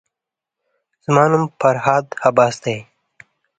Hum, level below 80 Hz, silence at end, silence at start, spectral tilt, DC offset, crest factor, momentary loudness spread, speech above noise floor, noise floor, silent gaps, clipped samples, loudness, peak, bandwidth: none; -60 dBFS; 0.75 s; 1.1 s; -6 dB/octave; under 0.1%; 18 dB; 11 LU; 69 dB; -85 dBFS; none; under 0.1%; -16 LUFS; 0 dBFS; 9.4 kHz